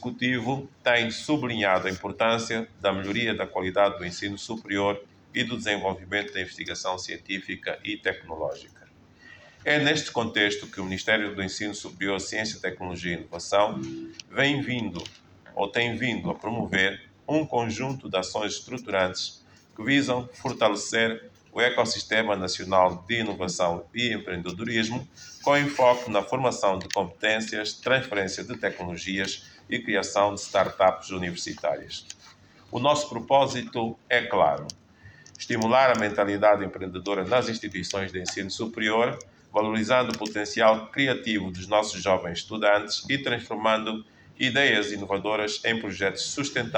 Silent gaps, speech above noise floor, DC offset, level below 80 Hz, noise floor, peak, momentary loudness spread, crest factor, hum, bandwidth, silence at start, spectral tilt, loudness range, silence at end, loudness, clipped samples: none; 27 dB; under 0.1%; -60 dBFS; -53 dBFS; -6 dBFS; 11 LU; 20 dB; none; over 20 kHz; 0 s; -4 dB/octave; 4 LU; 0 s; -26 LUFS; under 0.1%